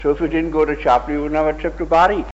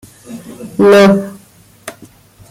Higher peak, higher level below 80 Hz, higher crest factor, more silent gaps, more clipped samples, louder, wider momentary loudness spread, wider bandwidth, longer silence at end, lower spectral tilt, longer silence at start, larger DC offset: second, -4 dBFS vs 0 dBFS; first, -32 dBFS vs -52 dBFS; about the same, 14 dB vs 14 dB; neither; neither; second, -18 LUFS vs -9 LUFS; second, 6 LU vs 25 LU; second, 8 kHz vs 15.5 kHz; second, 0 s vs 0.6 s; about the same, -6.5 dB/octave vs -6 dB/octave; second, 0 s vs 0.3 s; neither